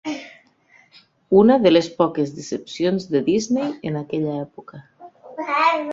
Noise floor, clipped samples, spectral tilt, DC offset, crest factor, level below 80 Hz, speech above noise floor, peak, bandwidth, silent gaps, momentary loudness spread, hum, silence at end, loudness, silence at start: -55 dBFS; under 0.1%; -6 dB/octave; under 0.1%; 18 dB; -58 dBFS; 36 dB; -2 dBFS; 7.8 kHz; none; 17 LU; none; 0 s; -20 LUFS; 0.05 s